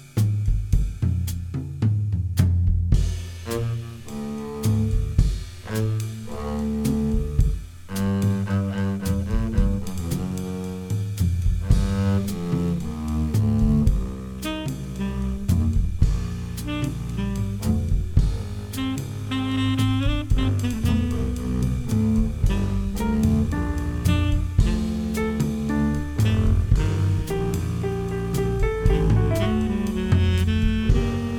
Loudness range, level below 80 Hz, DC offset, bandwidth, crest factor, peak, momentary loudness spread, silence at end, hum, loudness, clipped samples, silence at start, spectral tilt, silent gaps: 3 LU; -28 dBFS; under 0.1%; 18.5 kHz; 18 dB; -4 dBFS; 8 LU; 0 s; none; -24 LUFS; under 0.1%; 0 s; -7 dB/octave; none